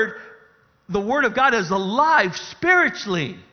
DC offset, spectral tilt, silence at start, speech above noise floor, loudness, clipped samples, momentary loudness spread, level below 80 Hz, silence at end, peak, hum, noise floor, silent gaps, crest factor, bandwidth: under 0.1%; -4.5 dB/octave; 0 s; 36 dB; -19 LUFS; under 0.1%; 9 LU; -56 dBFS; 0.1 s; -2 dBFS; none; -56 dBFS; none; 18 dB; 6.8 kHz